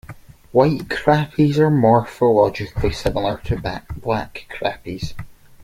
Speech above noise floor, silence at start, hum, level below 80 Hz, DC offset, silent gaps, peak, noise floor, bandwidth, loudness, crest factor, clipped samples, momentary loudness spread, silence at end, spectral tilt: 22 dB; 0.1 s; none; -38 dBFS; under 0.1%; none; -2 dBFS; -40 dBFS; 16 kHz; -19 LUFS; 18 dB; under 0.1%; 14 LU; 0.3 s; -7.5 dB/octave